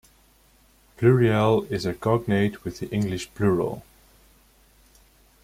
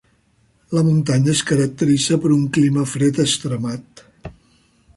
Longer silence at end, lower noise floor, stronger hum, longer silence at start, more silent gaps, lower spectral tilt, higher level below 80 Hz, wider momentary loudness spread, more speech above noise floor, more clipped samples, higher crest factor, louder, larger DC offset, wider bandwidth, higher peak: first, 1.65 s vs 0.65 s; about the same, -58 dBFS vs -59 dBFS; neither; first, 1 s vs 0.7 s; neither; first, -7 dB/octave vs -5.5 dB/octave; about the same, -52 dBFS vs -52 dBFS; about the same, 11 LU vs 9 LU; second, 36 dB vs 42 dB; neither; first, 20 dB vs 14 dB; second, -23 LUFS vs -18 LUFS; neither; first, 16 kHz vs 11.5 kHz; about the same, -6 dBFS vs -4 dBFS